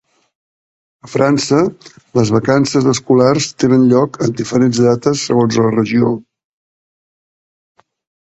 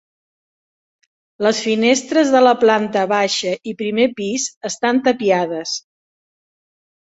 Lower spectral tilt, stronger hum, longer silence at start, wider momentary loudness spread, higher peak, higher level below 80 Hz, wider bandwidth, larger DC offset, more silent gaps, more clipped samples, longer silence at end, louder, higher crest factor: first, -6 dB/octave vs -3.5 dB/octave; neither; second, 1.05 s vs 1.4 s; second, 6 LU vs 11 LU; about the same, 0 dBFS vs -2 dBFS; first, -50 dBFS vs -64 dBFS; about the same, 8.2 kHz vs 8.2 kHz; neither; second, none vs 4.57-4.61 s; neither; first, 2.05 s vs 1.25 s; first, -13 LUFS vs -17 LUFS; about the same, 14 dB vs 16 dB